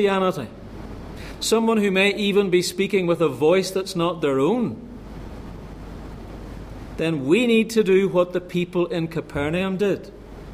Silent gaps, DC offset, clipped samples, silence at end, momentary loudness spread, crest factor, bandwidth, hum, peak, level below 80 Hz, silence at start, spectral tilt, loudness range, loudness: none; under 0.1%; under 0.1%; 0 s; 20 LU; 16 dB; 15.5 kHz; none; -6 dBFS; -44 dBFS; 0 s; -5.5 dB/octave; 6 LU; -21 LUFS